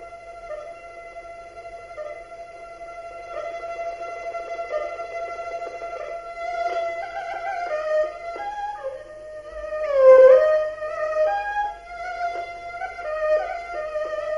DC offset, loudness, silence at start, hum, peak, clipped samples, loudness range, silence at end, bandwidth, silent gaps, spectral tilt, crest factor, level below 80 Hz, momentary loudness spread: under 0.1%; -23 LUFS; 0 s; 50 Hz at -65 dBFS; -4 dBFS; under 0.1%; 16 LU; 0 s; 7.2 kHz; none; -3.5 dB/octave; 20 dB; -54 dBFS; 18 LU